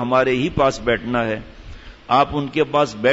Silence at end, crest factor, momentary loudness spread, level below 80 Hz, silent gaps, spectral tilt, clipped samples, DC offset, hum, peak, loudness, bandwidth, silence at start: 0 s; 14 dB; 6 LU; -42 dBFS; none; -5.5 dB/octave; under 0.1%; under 0.1%; none; -4 dBFS; -19 LUFS; 8 kHz; 0 s